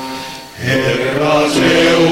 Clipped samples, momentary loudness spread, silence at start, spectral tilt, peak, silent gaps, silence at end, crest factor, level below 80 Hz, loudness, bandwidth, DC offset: under 0.1%; 15 LU; 0 s; -4.5 dB/octave; -4 dBFS; none; 0 s; 10 dB; -42 dBFS; -13 LUFS; 16.5 kHz; under 0.1%